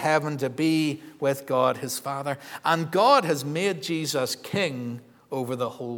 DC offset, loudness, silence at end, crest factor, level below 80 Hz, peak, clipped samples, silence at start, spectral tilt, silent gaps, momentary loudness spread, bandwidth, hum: under 0.1%; -25 LUFS; 0 s; 20 dB; -76 dBFS; -6 dBFS; under 0.1%; 0 s; -4.5 dB/octave; none; 11 LU; 19.5 kHz; none